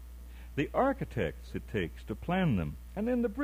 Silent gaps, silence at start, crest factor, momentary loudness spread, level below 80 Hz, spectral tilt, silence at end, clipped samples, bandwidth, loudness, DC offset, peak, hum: none; 0 s; 16 dB; 11 LU; -46 dBFS; -8 dB/octave; 0 s; under 0.1%; 16 kHz; -33 LUFS; under 0.1%; -16 dBFS; none